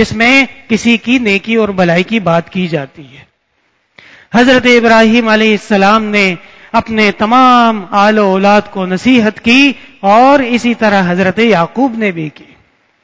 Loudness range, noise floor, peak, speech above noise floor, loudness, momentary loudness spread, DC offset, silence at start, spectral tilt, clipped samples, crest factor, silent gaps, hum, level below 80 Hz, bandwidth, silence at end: 4 LU; -59 dBFS; 0 dBFS; 50 dB; -9 LUFS; 9 LU; under 0.1%; 0 s; -5.5 dB/octave; 0.9%; 10 dB; none; none; -44 dBFS; 8 kHz; 0.75 s